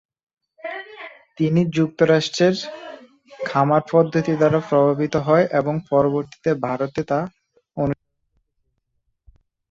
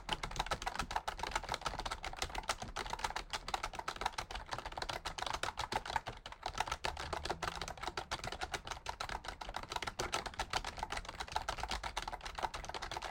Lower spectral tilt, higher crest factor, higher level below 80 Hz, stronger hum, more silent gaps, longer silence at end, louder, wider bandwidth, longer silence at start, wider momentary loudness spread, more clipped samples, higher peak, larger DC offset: first, -6.5 dB/octave vs -2.5 dB/octave; about the same, 20 dB vs 24 dB; about the same, -56 dBFS vs -52 dBFS; neither; neither; first, 1.75 s vs 0 s; first, -20 LUFS vs -41 LUFS; second, 7.8 kHz vs 17 kHz; first, 0.65 s vs 0 s; first, 16 LU vs 5 LU; neither; first, -2 dBFS vs -18 dBFS; neither